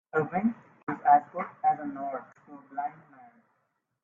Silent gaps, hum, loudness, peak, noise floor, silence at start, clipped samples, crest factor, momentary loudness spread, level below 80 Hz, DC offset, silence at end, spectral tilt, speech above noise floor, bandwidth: 0.83-0.87 s; none; -29 LUFS; -8 dBFS; -77 dBFS; 0.15 s; under 0.1%; 22 dB; 17 LU; -74 dBFS; under 0.1%; 1.1 s; -10 dB/octave; 49 dB; 3.2 kHz